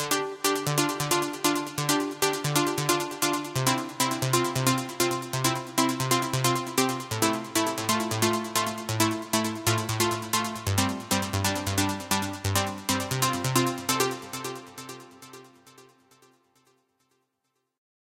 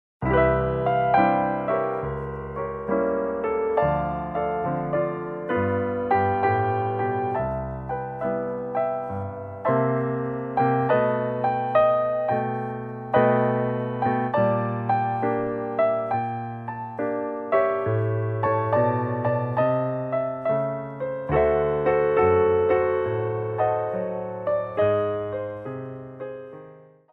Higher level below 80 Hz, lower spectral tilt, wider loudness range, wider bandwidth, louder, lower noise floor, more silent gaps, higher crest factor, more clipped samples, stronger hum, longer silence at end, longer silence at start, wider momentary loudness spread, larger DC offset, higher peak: second, -60 dBFS vs -46 dBFS; second, -3.5 dB/octave vs -10.5 dB/octave; about the same, 4 LU vs 4 LU; first, 17 kHz vs 4.8 kHz; about the same, -26 LUFS vs -24 LUFS; first, -78 dBFS vs -48 dBFS; neither; first, 22 dB vs 16 dB; neither; neither; first, 2.35 s vs 0.3 s; second, 0 s vs 0.2 s; second, 3 LU vs 11 LU; neither; about the same, -4 dBFS vs -6 dBFS